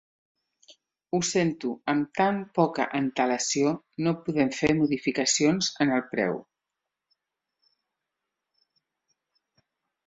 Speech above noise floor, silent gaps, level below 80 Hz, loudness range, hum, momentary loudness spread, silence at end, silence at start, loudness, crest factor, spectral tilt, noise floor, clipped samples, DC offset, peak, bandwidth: 61 dB; none; -64 dBFS; 7 LU; none; 5 LU; 3.65 s; 0.7 s; -26 LUFS; 20 dB; -4 dB/octave; -86 dBFS; under 0.1%; under 0.1%; -8 dBFS; 8.2 kHz